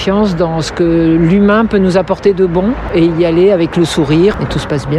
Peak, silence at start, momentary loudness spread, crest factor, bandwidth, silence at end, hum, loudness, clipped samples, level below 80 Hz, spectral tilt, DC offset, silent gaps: 0 dBFS; 0 s; 5 LU; 10 dB; 12 kHz; 0 s; none; -11 LUFS; under 0.1%; -30 dBFS; -7 dB/octave; under 0.1%; none